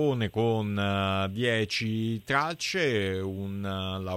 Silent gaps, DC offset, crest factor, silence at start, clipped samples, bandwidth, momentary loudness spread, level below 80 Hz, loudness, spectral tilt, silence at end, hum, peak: none; under 0.1%; 18 dB; 0 s; under 0.1%; 16 kHz; 6 LU; -62 dBFS; -28 LUFS; -5.5 dB/octave; 0 s; none; -10 dBFS